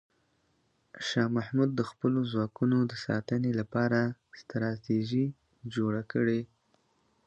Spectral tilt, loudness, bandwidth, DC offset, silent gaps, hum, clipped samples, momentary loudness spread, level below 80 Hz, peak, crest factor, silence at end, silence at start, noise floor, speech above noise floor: -7 dB/octave; -31 LUFS; 8.2 kHz; under 0.1%; none; none; under 0.1%; 8 LU; -68 dBFS; -14 dBFS; 18 dB; 0.8 s; 0.95 s; -72 dBFS; 43 dB